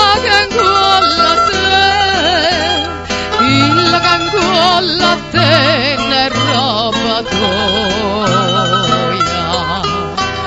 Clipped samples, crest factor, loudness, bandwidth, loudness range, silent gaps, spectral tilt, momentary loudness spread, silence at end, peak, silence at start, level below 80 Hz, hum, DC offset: under 0.1%; 12 dB; -11 LUFS; 11 kHz; 3 LU; none; -4 dB/octave; 6 LU; 0 s; 0 dBFS; 0 s; -36 dBFS; none; 0.3%